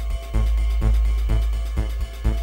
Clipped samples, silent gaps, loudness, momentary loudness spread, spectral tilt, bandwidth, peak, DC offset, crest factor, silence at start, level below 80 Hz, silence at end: under 0.1%; none; -24 LUFS; 5 LU; -6.5 dB/octave; 9.8 kHz; -8 dBFS; under 0.1%; 12 dB; 0 s; -20 dBFS; 0 s